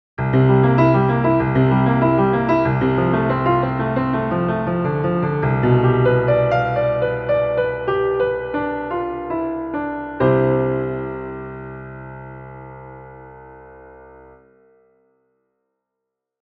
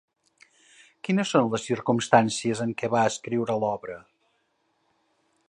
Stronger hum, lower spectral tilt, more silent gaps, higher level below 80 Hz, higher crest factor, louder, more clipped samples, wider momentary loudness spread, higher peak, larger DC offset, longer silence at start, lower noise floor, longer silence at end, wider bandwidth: neither; first, -10.5 dB/octave vs -5 dB/octave; neither; first, -42 dBFS vs -66 dBFS; second, 16 dB vs 24 dB; first, -18 LUFS vs -25 LUFS; neither; first, 19 LU vs 13 LU; about the same, -2 dBFS vs -2 dBFS; neither; second, 0.2 s vs 1.05 s; first, -81 dBFS vs -72 dBFS; first, 2.35 s vs 1.5 s; second, 5 kHz vs 11 kHz